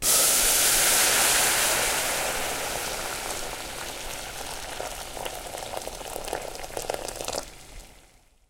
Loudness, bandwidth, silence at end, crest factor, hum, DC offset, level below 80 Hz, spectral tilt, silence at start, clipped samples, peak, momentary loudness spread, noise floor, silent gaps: -24 LUFS; 17 kHz; 0.55 s; 18 dB; none; under 0.1%; -46 dBFS; 0 dB/octave; 0 s; under 0.1%; -8 dBFS; 16 LU; -57 dBFS; none